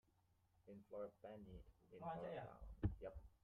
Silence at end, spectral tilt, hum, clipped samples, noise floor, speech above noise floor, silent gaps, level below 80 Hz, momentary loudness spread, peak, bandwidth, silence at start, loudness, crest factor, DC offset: 0.1 s; -8 dB/octave; none; under 0.1%; -80 dBFS; 26 dB; none; -62 dBFS; 16 LU; -28 dBFS; 4.4 kHz; 0.65 s; -53 LUFS; 26 dB; under 0.1%